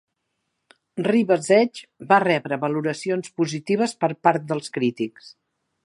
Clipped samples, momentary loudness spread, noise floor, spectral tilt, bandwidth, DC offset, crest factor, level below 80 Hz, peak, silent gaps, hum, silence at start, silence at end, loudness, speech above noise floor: under 0.1%; 10 LU; -77 dBFS; -5.5 dB/octave; 11.5 kHz; under 0.1%; 22 dB; -74 dBFS; -2 dBFS; none; none; 0.95 s; 0.55 s; -22 LUFS; 55 dB